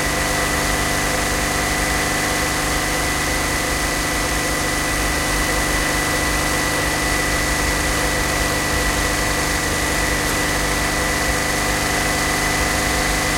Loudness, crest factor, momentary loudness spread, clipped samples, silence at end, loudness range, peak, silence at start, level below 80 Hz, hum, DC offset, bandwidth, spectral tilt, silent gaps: -18 LUFS; 14 dB; 1 LU; under 0.1%; 0 s; 1 LU; -6 dBFS; 0 s; -28 dBFS; 50 Hz at -35 dBFS; under 0.1%; 16.5 kHz; -2.5 dB/octave; none